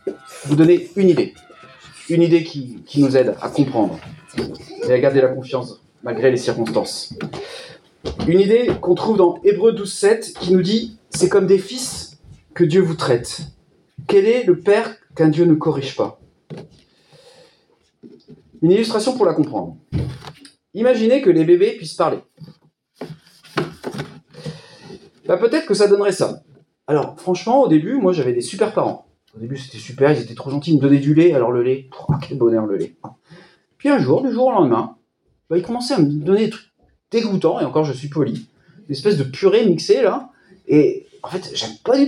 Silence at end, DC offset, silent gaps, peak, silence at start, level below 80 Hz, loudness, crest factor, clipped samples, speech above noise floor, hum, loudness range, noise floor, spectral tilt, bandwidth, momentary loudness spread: 0 s; under 0.1%; none; -2 dBFS; 0.05 s; -52 dBFS; -17 LUFS; 16 dB; under 0.1%; 48 dB; none; 4 LU; -65 dBFS; -6.5 dB/octave; 12 kHz; 17 LU